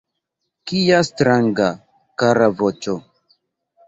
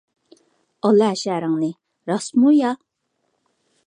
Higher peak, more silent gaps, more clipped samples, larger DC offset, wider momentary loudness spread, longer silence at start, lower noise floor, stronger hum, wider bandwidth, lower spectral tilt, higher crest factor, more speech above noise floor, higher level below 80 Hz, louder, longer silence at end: about the same, -2 dBFS vs -4 dBFS; neither; neither; neither; first, 15 LU vs 11 LU; second, 0.65 s vs 0.85 s; first, -77 dBFS vs -72 dBFS; neither; second, 8 kHz vs 10.5 kHz; about the same, -5.5 dB/octave vs -6 dB/octave; about the same, 18 dB vs 16 dB; first, 60 dB vs 54 dB; first, -56 dBFS vs -76 dBFS; about the same, -18 LUFS vs -19 LUFS; second, 0.85 s vs 1.1 s